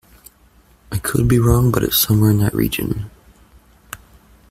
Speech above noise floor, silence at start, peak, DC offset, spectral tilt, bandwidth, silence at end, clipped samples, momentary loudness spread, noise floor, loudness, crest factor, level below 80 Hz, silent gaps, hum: 36 dB; 0.9 s; -2 dBFS; under 0.1%; -5.5 dB/octave; 16 kHz; 0.55 s; under 0.1%; 22 LU; -52 dBFS; -17 LUFS; 18 dB; -34 dBFS; none; none